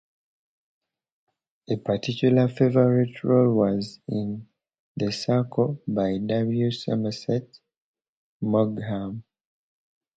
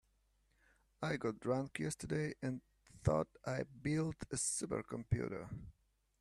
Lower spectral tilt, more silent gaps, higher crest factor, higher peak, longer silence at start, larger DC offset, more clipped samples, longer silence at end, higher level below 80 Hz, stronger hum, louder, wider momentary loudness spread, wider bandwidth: first, -8 dB/octave vs -5.5 dB/octave; first, 4.79-4.95 s, 7.77-7.94 s, 8.08-8.40 s vs none; about the same, 20 dB vs 20 dB; first, -6 dBFS vs -22 dBFS; first, 1.7 s vs 1 s; neither; neither; first, 0.95 s vs 0.5 s; about the same, -60 dBFS vs -60 dBFS; neither; first, -24 LUFS vs -40 LUFS; first, 11 LU vs 8 LU; second, 8 kHz vs 13 kHz